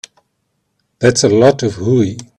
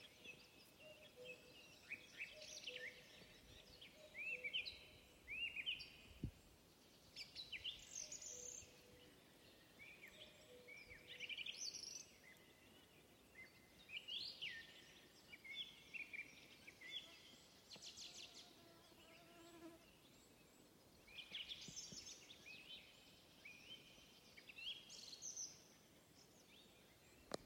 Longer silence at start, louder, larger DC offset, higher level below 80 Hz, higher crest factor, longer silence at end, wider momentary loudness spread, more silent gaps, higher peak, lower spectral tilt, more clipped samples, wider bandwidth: first, 1 s vs 0 s; first, -13 LUFS vs -53 LUFS; neither; first, -50 dBFS vs -76 dBFS; second, 14 dB vs 26 dB; first, 0.15 s vs 0 s; second, 5 LU vs 19 LU; neither; first, 0 dBFS vs -32 dBFS; first, -5 dB/octave vs -1 dB/octave; neither; second, 11.5 kHz vs 16.5 kHz